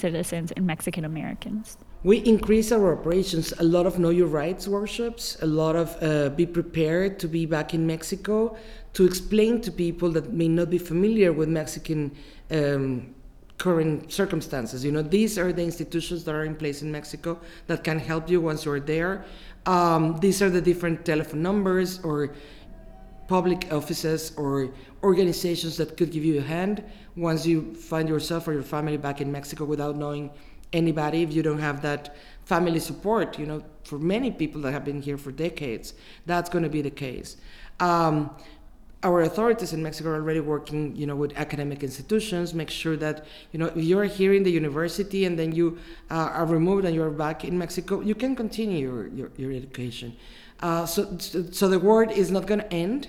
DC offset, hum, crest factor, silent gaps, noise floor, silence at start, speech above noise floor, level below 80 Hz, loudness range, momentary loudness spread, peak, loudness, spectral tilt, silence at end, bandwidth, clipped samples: under 0.1%; none; 18 dB; none; -46 dBFS; 0 s; 21 dB; -46 dBFS; 5 LU; 12 LU; -6 dBFS; -26 LUFS; -6 dB/octave; 0 s; 16.5 kHz; under 0.1%